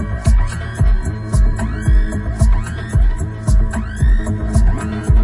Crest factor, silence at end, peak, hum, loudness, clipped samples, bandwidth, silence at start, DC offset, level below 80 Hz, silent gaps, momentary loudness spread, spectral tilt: 12 dB; 0 s; -2 dBFS; none; -18 LUFS; under 0.1%; 11.5 kHz; 0 s; under 0.1%; -16 dBFS; none; 4 LU; -7 dB/octave